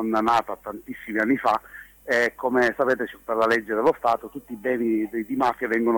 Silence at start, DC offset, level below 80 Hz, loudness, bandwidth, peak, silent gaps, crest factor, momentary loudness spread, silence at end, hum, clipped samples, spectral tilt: 0 s; under 0.1%; -58 dBFS; -23 LUFS; 19 kHz; -8 dBFS; none; 16 dB; 13 LU; 0 s; none; under 0.1%; -5.5 dB/octave